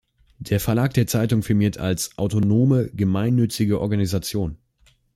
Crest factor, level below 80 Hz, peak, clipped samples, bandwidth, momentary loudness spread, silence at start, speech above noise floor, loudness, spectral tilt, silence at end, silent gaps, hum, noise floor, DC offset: 16 dB; -46 dBFS; -6 dBFS; under 0.1%; 15.5 kHz; 7 LU; 0.4 s; 40 dB; -21 LUFS; -6.5 dB/octave; 0.6 s; none; none; -60 dBFS; under 0.1%